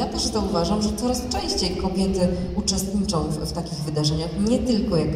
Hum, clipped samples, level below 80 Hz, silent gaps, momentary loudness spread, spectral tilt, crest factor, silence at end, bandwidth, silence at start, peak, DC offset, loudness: none; under 0.1%; -36 dBFS; none; 4 LU; -5 dB/octave; 14 dB; 0 s; 15 kHz; 0 s; -8 dBFS; under 0.1%; -23 LUFS